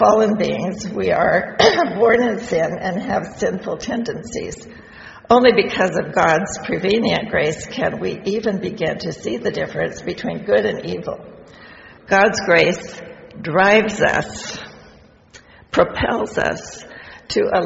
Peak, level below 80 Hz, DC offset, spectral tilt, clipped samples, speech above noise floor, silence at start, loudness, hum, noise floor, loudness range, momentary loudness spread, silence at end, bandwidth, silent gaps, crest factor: 0 dBFS; -46 dBFS; under 0.1%; -3 dB/octave; under 0.1%; 29 dB; 0 s; -18 LUFS; none; -47 dBFS; 5 LU; 17 LU; 0 s; 8 kHz; none; 18 dB